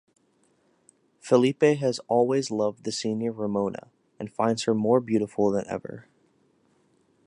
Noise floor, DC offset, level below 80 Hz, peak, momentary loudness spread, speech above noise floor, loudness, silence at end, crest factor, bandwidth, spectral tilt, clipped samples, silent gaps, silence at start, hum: -66 dBFS; under 0.1%; -68 dBFS; -6 dBFS; 16 LU; 42 dB; -25 LUFS; 1.25 s; 20 dB; 11 kHz; -5.5 dB/octave; under 0.1%; none; 1.25 s; none